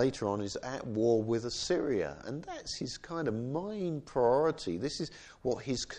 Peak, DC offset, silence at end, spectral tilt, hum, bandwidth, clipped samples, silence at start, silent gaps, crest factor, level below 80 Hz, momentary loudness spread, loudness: -16 dBFS; under 0.1%; 0 s; -5 dB/octave; none; 10 kHz; under 0.1%; 0 s; none; 18 dB; -60 dBFS; 10 LU; -34 LUFS